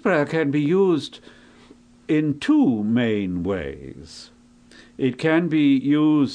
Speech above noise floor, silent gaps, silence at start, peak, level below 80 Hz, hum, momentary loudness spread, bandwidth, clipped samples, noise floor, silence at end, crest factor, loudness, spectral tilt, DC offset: 30 dB; none; 0.05 s; -8 dBFS; -54 dBFS; none; 18 LU; 9.8 kHz; under 0.1%; -50 dBFS; 0 s; 14 dB; -21 LUFS; -7.5 dB/octave; under 0.1%